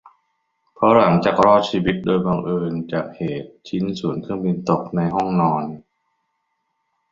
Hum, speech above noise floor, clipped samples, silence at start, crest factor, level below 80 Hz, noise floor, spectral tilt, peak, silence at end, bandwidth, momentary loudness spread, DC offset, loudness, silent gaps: none; 54 dB; under 0.1%; 0.8 s; 18 dB; -52 dBFS; -72 dBFS; -7.5 dB/octave; -2 dBFS; 1.3 s; 7.4 kHz; 13 LU; under 0.1%; -19 LUFS; none